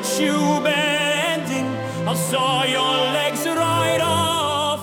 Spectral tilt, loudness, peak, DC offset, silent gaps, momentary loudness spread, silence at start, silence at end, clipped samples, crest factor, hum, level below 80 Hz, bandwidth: -3.5 dB/octave; -19 LUFS; -6 dBFS; under 0.1%; none; 5 LU; 0 s; 0 s; under 0.1%; 14 dB; none; -62 dBFS; 18 kHz